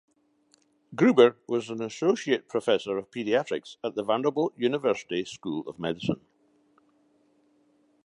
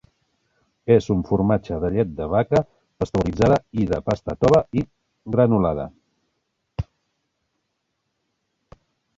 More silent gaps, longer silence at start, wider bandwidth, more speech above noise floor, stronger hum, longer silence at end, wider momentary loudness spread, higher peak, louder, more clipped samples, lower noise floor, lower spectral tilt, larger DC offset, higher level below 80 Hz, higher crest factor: neither; about the same, 0.9 s vs 0.85 s; first, 11 kHz vs 7.8 kHz; second, 40 dB vs 56 dB; neither; second, 1.85 s vs 2.35 s; second, 12 LU vs 17 LU; about the same, -4 dBFS vs -2 dBFS; second, -27 LUFS vs -21 LUFS; neither; second, -66 dBFS vs -75 dBFS; second, -5.5 dB/octave vs -8.5 dB/octave; neither; second, -70 dBFS vs -42 dBFS; about the same, 22 dB vs 20 dB